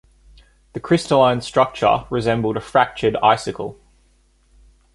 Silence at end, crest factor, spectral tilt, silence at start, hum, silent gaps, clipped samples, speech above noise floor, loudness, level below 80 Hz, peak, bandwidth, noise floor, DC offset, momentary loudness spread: 1.2 s; 18 dB; -5.5 dB/octave; 0.75 s; none; none; under 0.1%; 39 dB; -18 LUFS; -48 dBFS; -2 dBFS; 11.5 kHz; -57 dBFS; under 0.1%; 14 LU